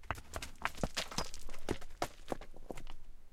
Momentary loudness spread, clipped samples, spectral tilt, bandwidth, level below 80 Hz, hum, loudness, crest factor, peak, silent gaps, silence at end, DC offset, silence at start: 12 LU; under 0.1%; -3.5 dB/octave; 15.5 kHz; -48 dBFS; none; -43 LUFS; 26 dB; -14 dBFS; none; 0.05 s; under 0.1%; 0 s